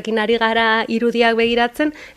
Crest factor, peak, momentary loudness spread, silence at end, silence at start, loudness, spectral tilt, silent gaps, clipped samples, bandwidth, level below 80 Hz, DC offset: 16 dB; -2 dBFS; 4 LU; 0.05 s; 0 s; -16 LUFS; -4.5 dB/octave; none; under 0.1%; 13.5 kHz; -50 dBFS; under 0.1%